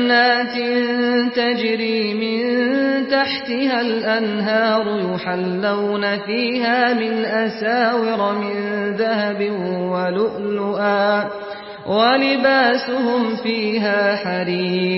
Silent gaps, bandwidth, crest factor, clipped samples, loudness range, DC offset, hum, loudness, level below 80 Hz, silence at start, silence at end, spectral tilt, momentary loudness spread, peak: none; 5.8 kHz; 16 dB; under 0.1%; 2 LU; under 0.1%; none; -19 LUFS; -64 dBFS; 0 s; 0 s; -9.5 dB/octave; 7 LU; -4 dBFS